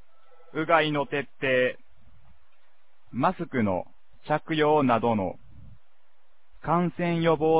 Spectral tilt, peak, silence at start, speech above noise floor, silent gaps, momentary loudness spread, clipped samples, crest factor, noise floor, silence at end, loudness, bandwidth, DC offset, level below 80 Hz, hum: -10 dB/octave; -8 dBFS; 0.55 s; 45 dB; none; 15 LU; under 0.1%; 20 dB; -70 dBFS; 0 s; -26 LUFS; 4 kHz; 0.7%; -58 dBFS; none